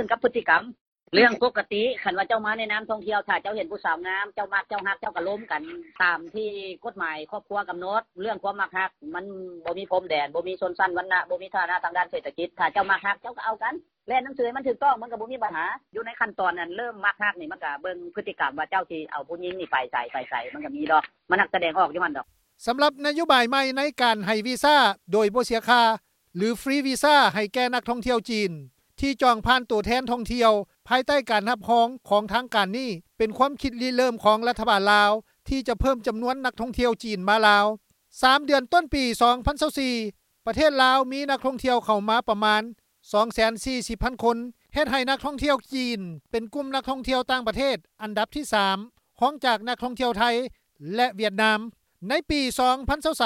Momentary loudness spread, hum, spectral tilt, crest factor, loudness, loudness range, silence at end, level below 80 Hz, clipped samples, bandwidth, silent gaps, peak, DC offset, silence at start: 12 LU; none; -4 dB/octave; 22 dB; -24 LUFS; 6 LU; 0 s; -48 dBFS; under 0.1%; 16.5 kHz; 0.81-0.92 s; -4 dBFS; under 0.1%; 0 s